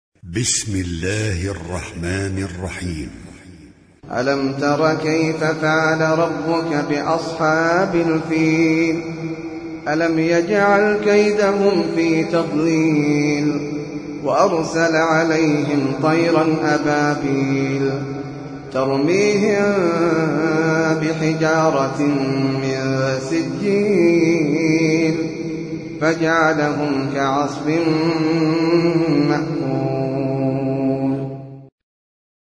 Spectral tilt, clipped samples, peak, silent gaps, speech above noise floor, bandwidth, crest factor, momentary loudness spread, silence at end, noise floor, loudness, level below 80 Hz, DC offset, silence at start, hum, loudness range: -5.5 dB/octave; under 0.1%; -2 dBFS; none; 27 dB; 10.5 kHz; 16 dB; 10 LU; 0.85 s; -45 dBFS; -18 LUFS; -48 dBFS; under 0.1%; 0.25 s; none; 4 LU